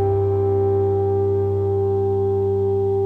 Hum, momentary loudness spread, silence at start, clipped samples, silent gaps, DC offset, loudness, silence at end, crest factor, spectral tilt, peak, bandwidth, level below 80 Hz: none; 1 LU; 0 s; under 0.1%; none; under 0.1%; -20 LUFS; 0 s; 8 dB; -11.5 dB/octave; -10 dBFS; 3.5 kHz; -48 dBFS